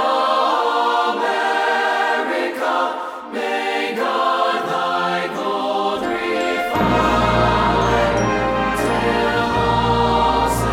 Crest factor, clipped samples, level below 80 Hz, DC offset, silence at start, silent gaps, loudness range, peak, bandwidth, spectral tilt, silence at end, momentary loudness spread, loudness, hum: 14 dB; under 0.1%; -36 dBFS; under 0.1%; 0 s; none; 3 LU; -4 dBFS; 19 kHz; -5 dB/octave; 0 s; 5 LU; -18 LUFS; none